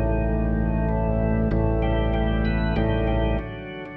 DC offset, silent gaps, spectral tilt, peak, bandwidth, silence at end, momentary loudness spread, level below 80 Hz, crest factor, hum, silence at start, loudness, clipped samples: under 0.1%; none; -10.5 dB/octave; -10 dBFS; 4.2 kHz; 0 s; 3 LU; -26 dBFS; 12 dB; none; 0 s; -24 LUFS; under 0.1%